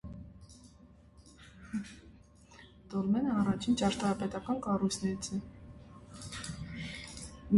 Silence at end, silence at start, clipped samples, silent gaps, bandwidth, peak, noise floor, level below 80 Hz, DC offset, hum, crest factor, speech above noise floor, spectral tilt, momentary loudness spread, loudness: 0 s; 0.05 s; under 0.1%; none; 11.5 kHz; -14 dBFS; -58 dBFS; -56 dBFS; under 0.1%; none; 20 dB; 26 dB; -5.5 dB/octave; 25 LU; -34 LUFS